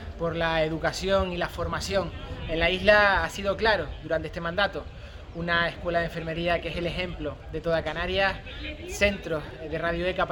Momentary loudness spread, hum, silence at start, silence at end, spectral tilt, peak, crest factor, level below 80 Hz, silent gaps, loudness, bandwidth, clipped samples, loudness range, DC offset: 12 LU; none; 0 s; 0 s; -4.5 dB/octave; -6 dBFS; 22 dB; -40 dBFS; none; -27 LUFS; 18.5 kHz; under 0.1%; 4 LU; under 0.1%